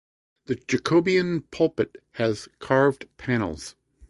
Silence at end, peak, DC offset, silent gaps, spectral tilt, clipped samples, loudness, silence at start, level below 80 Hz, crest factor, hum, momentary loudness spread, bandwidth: 0.4 s; -6 dBFS; under 0.1%; none; -6 dB/octave; under 0.1%; -25 LUFS; 0.5 s; -54 dBFS; 20 dB; none; 12 LU; 11.5 kHz